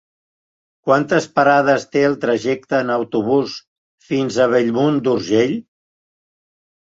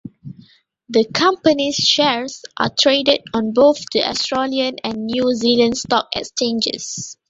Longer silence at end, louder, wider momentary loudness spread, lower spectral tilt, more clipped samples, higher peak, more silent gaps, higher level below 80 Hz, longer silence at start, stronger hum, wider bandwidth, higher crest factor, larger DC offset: first, 1.35 s vs 0.15 s; about the same, -17 LUFS vs -17 LUFS; about the same, 7 LU vs 9 LU; first, -6 dB/octave vs -3 dB/octave; neither; about the same, -2 dBFS vs 0 dBFS; first, 3.68-3.98 s vs none; second, -62 dBFS vs -56 dBFS; first, 0.85 s vs 0.05 s; neither; about the same, 8 kHz vs 8 kHz; about the same, 18 dB vs 18 dB; neither